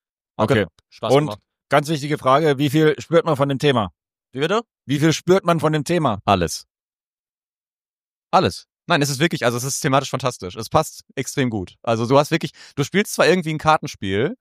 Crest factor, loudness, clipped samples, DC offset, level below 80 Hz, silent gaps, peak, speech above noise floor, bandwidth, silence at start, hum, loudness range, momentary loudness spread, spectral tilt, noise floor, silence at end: 18 dB; -20 LUFS; under 0.1%; under 0.1%; -52 dBFS; 6.70-6.75 s, 6.83-6.93 s, 7.05-7.62 s, 7.69-8.22 s; -2 dBFS; over 71 dB; 15.5 kHz; 0.4 s; none; 4 LU; 10 LU; -5 dB/octave; under -90 dBFS; 0.05 s